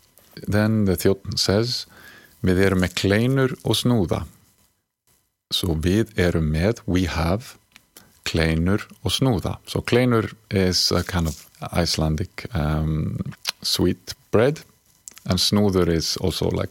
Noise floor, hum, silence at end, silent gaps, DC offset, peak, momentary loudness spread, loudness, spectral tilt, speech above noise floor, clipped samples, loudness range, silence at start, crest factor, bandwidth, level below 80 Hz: -66 dBFS; none; 0 s; none; under 0.1%; -2 dBFS; 9 LU; -22 LUFS; -5 dB/octave; 44 dB; under 0.1%; 3 LU; 0.35 s; 20 dB; 17 kHz; -38 dBFS